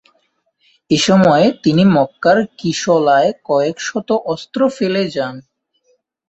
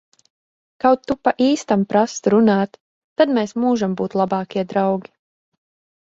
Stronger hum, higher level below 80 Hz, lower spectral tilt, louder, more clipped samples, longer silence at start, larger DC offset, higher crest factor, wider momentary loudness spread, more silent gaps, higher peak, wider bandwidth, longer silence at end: neither; about the same, -54 dBFS vs -58 dBFS; about the same, -5.5 dB/octave vs -6 dB/octave; first, -15 LUFS vs -19 LUFS; neither; about the same, 0.9 s vs 0.85 s; neither; about the same, 14 dB vs 18 dB; first, 9 LU vs 6 LU; second, none vs 2.80-3.16 s; about the same, -2 dBFS vs -2 dBFS; about the same, 8.2 kHz vs 8 kHz; about the same, 0.9 s vs 1 s